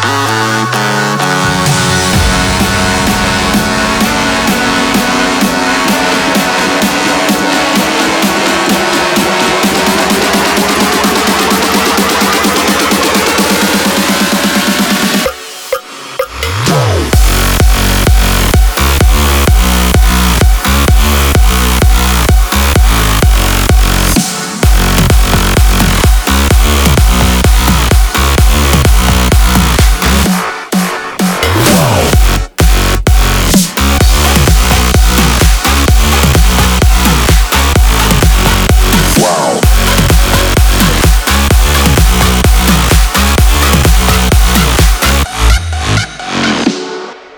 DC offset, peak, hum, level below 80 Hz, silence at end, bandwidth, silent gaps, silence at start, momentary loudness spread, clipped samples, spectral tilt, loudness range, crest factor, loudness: under 0.1%; 0 dBFS; none; -12 dBFS; 0 s; over 20 kHz; none; 0 s; 3 LU; 0.2%; -4 dB/octave; 2 LU; 8 dB; -9 LUFS